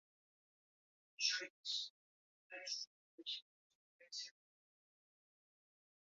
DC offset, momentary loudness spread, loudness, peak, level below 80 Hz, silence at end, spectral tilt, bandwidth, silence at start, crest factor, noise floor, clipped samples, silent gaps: under 0.1%; 14 LU; -44 LUFS; -24 dBFS; under -90 dBFS; 1.75 s; 5 dB/octave; 7.4 kHz; 1.2 s; 26 dB; under -90 dBFS; under 0.1%; 1.50-1.64 s, 1.90-2.50 s, 2.87-3.18 s, 3.42-3.99 s